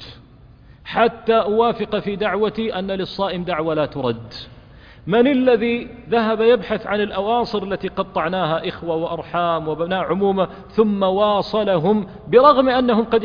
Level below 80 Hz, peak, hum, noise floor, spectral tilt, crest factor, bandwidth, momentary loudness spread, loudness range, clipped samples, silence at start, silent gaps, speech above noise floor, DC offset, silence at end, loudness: -48 dBFS; 0 dBFS; none; -45 dBFS; -8 dB/octave; 18 dB; 5.2 kHz; 9 LU; 5 LU; under 0.1%; 0 s; none; 27 dB; under 0.1%; 0 s; -19 LUFS